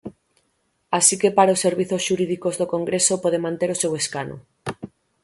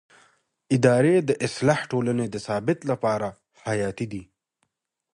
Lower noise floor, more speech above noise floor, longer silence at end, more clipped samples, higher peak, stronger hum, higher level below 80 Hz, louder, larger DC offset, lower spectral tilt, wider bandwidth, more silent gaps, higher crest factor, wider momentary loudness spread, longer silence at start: second, -69 dBFS vs -79 dBFS; second, 48 dB vs 56 dB; second, 0.35 s vs 0.9 s; neither; first, 0 dBFS vs -4 dBFS; neither; about the same, -62 dBFS vs -60 dBFS; first, -20 LUFS vs -24 LUFS; neither; second, -3.5 dB/octave vs -6.5 dB/octave; about the same, 12 kHz vs 11.5 kHz; neither; about the same, 22 dB vs 20 dB; first, 17 LU vs 14 LU; second, 0.05 s vs 0.7 s